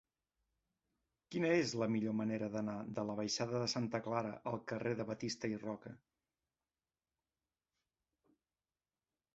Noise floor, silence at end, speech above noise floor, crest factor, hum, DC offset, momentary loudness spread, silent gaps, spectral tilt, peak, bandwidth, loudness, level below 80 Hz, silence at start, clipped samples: under -90 dBFS; 3.4 s; over 51 dB; 20 dB; none; under 0.1%; 9 LU; none; -5 dB/octave; -22 dBFS; 7.6 kHz; -39 LUFS; -76 dBFS; 1.3 s; under 0.1%